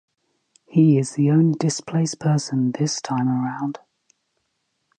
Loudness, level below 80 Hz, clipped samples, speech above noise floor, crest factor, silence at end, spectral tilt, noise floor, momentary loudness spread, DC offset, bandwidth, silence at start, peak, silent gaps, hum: -21 LUFS; -68 dBFS; under 0.1%; 54 dB; 16 dB; 1.25 s; -6.5 dB/octave; -73 dBFS; 9 LU; under 0.1%; 9.6 kHz; 0.7 s; -4 dBFS; none; none